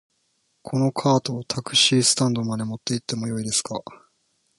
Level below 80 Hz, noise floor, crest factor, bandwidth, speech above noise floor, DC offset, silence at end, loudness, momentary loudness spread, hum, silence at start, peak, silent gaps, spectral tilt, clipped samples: -62 dBFS; -70 dBFS; 20 dB; 11.5 kHz; 47 dB; under 0.1%; 0.65 s; -22 LUFS; 12 LU; none; 0.65 s; -4 dBFS; none; -3.5 dB/octave; under 0.1%